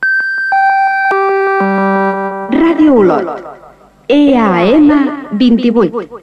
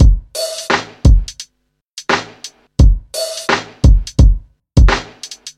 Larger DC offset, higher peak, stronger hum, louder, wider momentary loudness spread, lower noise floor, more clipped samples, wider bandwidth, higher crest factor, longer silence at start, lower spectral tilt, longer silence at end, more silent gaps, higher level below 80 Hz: neither; about the same, -2 dBFS vs 0 dBFS; neither; first, -10 LUFS vs -15 LUFS; second, 8 LU vs 17 LU; second, -40 dBFS vs -67 dBFS; neither; second, 6.8 kHz vs 13 kHz; about the same, 10 dB vs 12 dB; about the same, 0 s vs 0 s; first, -7.5 dB/octave vs -5 dB/octave; about the same, 0.05 s vs 0.05 s; second, none vs 1.84-1.97 s; second, -44 dBFS vs -14 dBFS